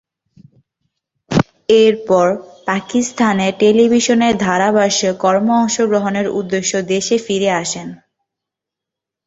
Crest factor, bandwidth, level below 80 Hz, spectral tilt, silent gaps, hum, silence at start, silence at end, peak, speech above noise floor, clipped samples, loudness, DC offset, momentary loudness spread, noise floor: 16 dB; 8 kHz; -52 dBFS; -4.5 dB/octave; none; none; 1.3 s; 1.3 s; 0 dBFS; 69 dB; under 0.1%; -15 LUFS; under 0.1%; 7 LU; -84 dBFS